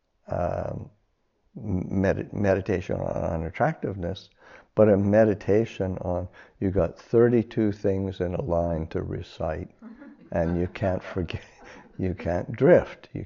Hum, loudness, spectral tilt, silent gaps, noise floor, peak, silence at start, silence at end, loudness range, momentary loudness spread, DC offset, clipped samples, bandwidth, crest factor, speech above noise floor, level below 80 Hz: none; -26 LUFS; -7.5 dB/octave; none; -70 dBFS; -6 dBFS; 0.3 s; 0 s; 6 LU; 14 LU; under 0.1%; under 0.1%; 7.2 kHz; 20 dB; 45 dB; -46 dBFS